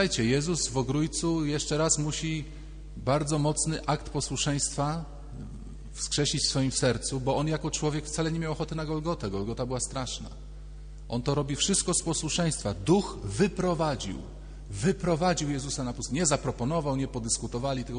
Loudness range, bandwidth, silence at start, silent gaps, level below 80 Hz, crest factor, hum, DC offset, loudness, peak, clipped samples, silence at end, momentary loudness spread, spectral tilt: 3 LU; 10 kHz; 0 s; none; -42 dBFS; 18 dB; none; under 0.1%; -29 LUFS; -10 dBFS; under 0.1%; 0 s; 16 LU; -4.5 dB/octave